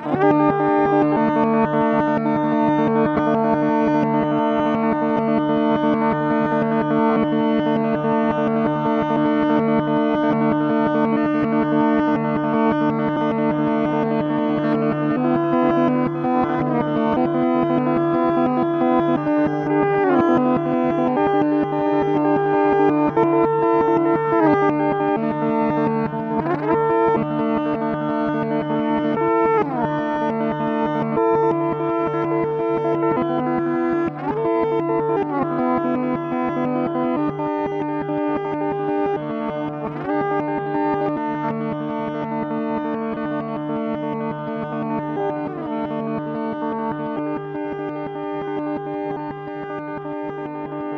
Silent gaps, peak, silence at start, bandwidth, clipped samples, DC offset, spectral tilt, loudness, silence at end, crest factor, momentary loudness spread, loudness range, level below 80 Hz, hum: none; -4 dBFS; 0 s; 6.2 kHz; under 0.1%; under 0.1%; -9 dB/octave; -20 LUFS; 0 s; 16 dB; 8 LU; 7 LU; -52 dBFS; none